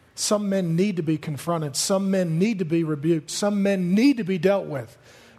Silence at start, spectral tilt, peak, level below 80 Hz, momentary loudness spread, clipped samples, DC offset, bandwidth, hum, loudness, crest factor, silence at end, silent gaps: 0.15 s; -5.5 dB/octave; -8 dBFS; -64 dBFS; 7 LU; under 0.1%; under 0.1%; 13.5 kHz; none; -23 LUFS; 16 dB; 0.45 s; none